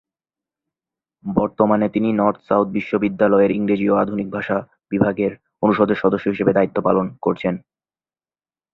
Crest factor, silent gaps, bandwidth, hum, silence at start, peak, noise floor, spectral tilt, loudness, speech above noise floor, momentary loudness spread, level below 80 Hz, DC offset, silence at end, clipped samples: 18 dB; none; 5.2 kHz; none; 1.25 s; -2 dBFS; under -90 dBFS; -10 dB/octave; -19 LUFS; over 72 dB; 8 LU; -54 dBFS; under 0.1%; 1.15 s; under 0.1%